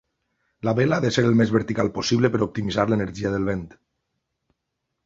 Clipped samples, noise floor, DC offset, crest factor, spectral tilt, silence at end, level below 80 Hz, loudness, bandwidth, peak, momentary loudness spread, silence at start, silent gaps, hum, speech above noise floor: under 0.1%; -79 dBFS; under 0.1%; 20 dB; -6 dB/octave; 1.4 s; -50 dBFS; -22 LUFS; 7.8 kHz; -4 dBFS; 7 LU; 0.65 s; none; none; 58 dB